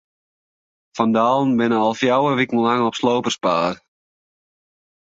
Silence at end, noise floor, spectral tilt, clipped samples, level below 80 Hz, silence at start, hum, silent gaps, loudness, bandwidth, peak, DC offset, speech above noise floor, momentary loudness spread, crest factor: 1.4 s; under -90 dBFS; -5.5 dB/octave; under 0.1%; -62 dBFS; 0.95 s; none; none; -18 LUFS; 7.8 kHz; -2 dBFS; under 0.1%; over 72 dB; 5 LU; 18 dB